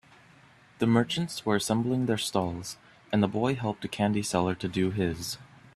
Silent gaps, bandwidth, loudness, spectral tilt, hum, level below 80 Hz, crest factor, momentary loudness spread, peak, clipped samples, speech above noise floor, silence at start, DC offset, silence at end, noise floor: none; 14 kHz; -28 LUFS; -5.5 dB/octave; none; -60 dBFS; 22 dB; 10 LU; -8 dBFS; under 0.1%; 29 dB; 0.8 s; under 0.1%; 0.3 s; -57 dBFS